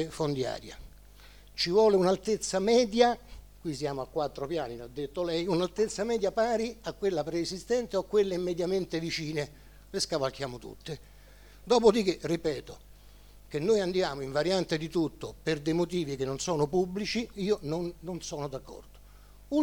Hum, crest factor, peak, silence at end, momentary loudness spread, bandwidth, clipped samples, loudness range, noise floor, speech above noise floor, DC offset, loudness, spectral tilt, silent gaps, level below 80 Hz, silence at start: 50 Hz at -55 dBFS; 22 dB; -8 dBFS; 0 s; 14 LU; 20 kHz; under 0.1%; 5 LU; -53 dBFS; 24 dB; under 0.1%; -30 LUFS; -5 dB/octave; none; -54 dBFS; 0 s